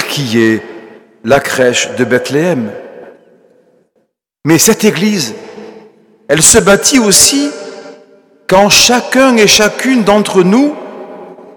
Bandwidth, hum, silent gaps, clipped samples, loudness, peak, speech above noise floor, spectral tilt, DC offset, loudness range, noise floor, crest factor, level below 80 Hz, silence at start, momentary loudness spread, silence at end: over 20 kHz; none; none; 0.5%; -8 LUFS; 0 dBFS; 52 dB; -3 dB/octave; under 0.1%; 7 LU; -60 dBFS; 12 dB; -40 dBFS; 0 s; 22 LU; 0.05 s